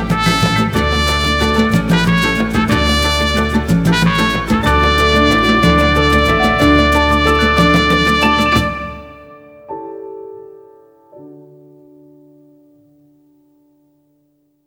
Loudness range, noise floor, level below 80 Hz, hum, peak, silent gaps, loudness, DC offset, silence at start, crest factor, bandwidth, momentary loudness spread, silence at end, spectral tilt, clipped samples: 20 LU; -59 dBFS; -24 dBFS; none; 0 dBFS; none; -12 LUFS; under 0.1%; 0 s; 14 dB; 18.5 kHz; 17 LU; 3.25 s; -5 dB/octave; under 0.1%